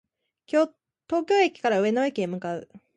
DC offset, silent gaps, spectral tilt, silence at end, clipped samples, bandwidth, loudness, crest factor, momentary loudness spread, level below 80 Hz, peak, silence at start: under 0.1%; none; -5.5 dB/octave; 0.2 s; under 0.1%; 9.4 kHz; -25 LUFS; 18 dB; 10 LU; -72 dBFS; -8 dBFS; 0.55 s